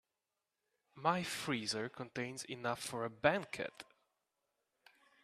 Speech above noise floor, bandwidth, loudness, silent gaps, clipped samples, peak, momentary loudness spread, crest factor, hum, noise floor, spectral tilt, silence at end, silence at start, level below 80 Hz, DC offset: 51 dB; 14.5 kHz; -39 LUFS; none; under 0.1%; -14 dBFS; 10 LU; 28 dB; none; -90 dBFS; -4 dB/octave; 1.4 s; 0.95 s; -76 dBFS; under 0.1%